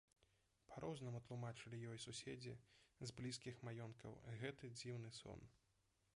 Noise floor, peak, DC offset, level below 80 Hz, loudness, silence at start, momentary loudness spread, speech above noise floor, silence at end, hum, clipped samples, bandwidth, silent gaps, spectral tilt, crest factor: -84 dBFS; -36 dBFS; under 0.1%; -78 dBFS; -54 LUFS; 0.2 s; 7 LU; 30 dB; 0.6 s; none; under 0.1%; 11 kHz; none; -5 dB/octave; 20 dB